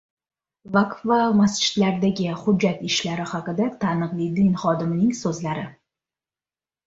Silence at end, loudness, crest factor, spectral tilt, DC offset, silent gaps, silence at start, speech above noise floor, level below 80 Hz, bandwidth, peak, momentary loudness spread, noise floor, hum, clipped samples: 1.15 s; -22 LUFS; 18 dB; -5.5 dB/octave; under 0.1%; none; 0.65 s; over 69 dB; -58 dBFS; 8 kHz; -6 dBFS; 8 LU; under -90 dBFS; none; under 0.1%